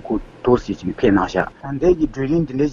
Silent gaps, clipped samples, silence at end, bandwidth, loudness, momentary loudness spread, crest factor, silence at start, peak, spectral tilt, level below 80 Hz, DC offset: none; under 0.1%; 0 s; 7.4 kHz; -19 LUFS; 8 LU; 18 dB; 0.05 s; 0 dBFS; -7.5 dB/octave; -36 dBFS; under 0.1%